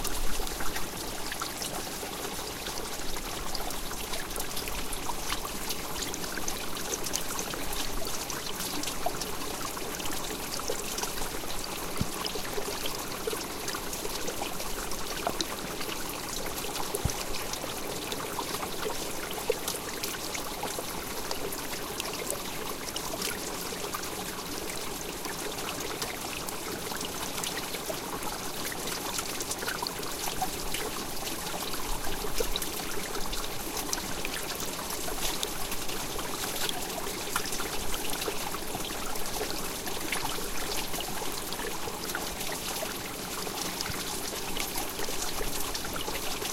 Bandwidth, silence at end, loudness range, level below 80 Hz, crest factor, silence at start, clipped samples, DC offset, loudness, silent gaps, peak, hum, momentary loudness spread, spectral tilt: 17 kHz; 0 s; 2 LU; -44 dBFS; 26 dB; 0 s; under 0.1%; under 0.1%; -33 LUFS; none; -6 dBFS; none; 3 LU; -2 dB/octave